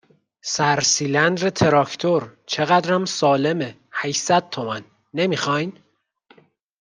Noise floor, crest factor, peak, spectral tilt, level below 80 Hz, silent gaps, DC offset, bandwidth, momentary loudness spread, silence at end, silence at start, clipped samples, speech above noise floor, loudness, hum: -58 dBFS; 18 dB; -2 dBFS; -3.5 dB/octave; -60 dBFS; none; under 0.1%; 11 kHz; 10 LU; 1.1 s; 0.45 s; under 0.1%; 38 dB; -20 LUFS; none